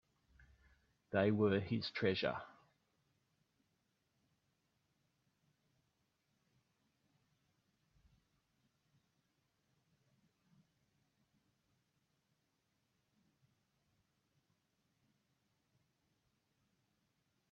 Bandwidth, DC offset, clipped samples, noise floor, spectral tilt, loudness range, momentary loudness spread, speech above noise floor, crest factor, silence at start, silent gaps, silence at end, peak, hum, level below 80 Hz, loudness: 7 kHz; under 0.1%; under 0.1%; -84 dBFS; -5 dB/octave; 8 LU; 8 LU; 47 dB; 28 dB; 1.1 s; none; 15.05 s; -20 dBFS; none; -80 dBFS; -37 LUFS